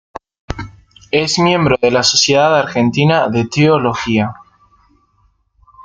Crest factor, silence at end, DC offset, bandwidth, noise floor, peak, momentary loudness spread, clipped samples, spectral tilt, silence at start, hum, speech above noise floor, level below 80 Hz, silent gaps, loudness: 14 dB; 0 s; under 0.1%; 9.4 kHz; -58 dBFS; 0 dBFS; 17 LU; under 0.1%; -4.5 dB/octave; 0.5 s; none; 45 dB; -42 dBFS; none; -13 LUFS